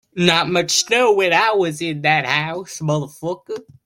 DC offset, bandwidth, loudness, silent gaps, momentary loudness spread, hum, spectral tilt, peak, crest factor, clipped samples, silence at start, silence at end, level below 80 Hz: under 0.1%; 16.5 kHz; -17 LUFS; none; 12 LU; none; -3.5 dB/octave; 0 dBFS; 18 dB; under 0.1%; 0.15 s; 0.25 s; -58 dBFS